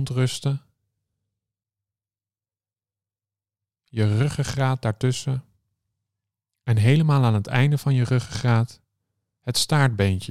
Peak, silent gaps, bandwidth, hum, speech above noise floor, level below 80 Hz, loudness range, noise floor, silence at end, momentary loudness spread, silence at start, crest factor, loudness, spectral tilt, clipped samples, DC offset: -4 dBFS; none; 14 kHz; none; over 69 dB; -56 dBFS; 10 LU; under -90 dBFS; 0.05 s; 11 LU; 0 s; 20 dB; -22 LUFS; -6 dB/octave; under 0.1%; under 0.1%